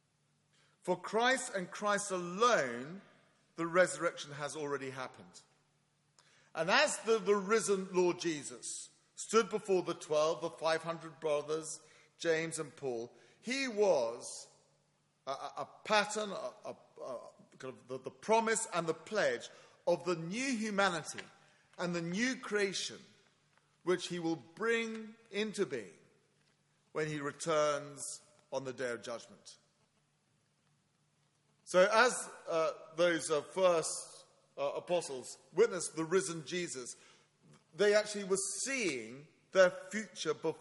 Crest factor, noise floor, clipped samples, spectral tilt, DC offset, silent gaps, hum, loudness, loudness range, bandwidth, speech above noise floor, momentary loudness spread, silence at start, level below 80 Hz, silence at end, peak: 24 dB; -76 dBFS; under 0.1%; -3.5 dB/octave; under 0.1%; none; none; -35 LUFS; 6 LU; 11.5 kHz; 41 dB; 16 LU; 0.85 s; -84 dBFS; 0 s; -12 dBFS